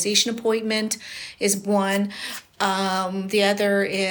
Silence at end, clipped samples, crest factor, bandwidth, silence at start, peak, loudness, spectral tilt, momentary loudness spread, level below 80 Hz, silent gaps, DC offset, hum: 0 s; under 0.1%; 20 dB; over 20 kHz; 0 s; -4 dBFS; -22 LUFS; -3 dB/octave; 9 LU; -68 dBFS; none; under 0.1%; none